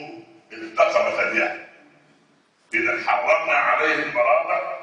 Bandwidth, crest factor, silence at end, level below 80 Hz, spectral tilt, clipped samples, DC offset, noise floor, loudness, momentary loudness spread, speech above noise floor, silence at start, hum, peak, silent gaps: 9.6 kHz; 18 dB; 0 s; -70 dBFS; -3.5 dB/octave; under 0.1%; under 0.1%; -60 dBFS; -20 LUFS; 10 LU; 39 dB; 0 s; none; -4 dBFS; none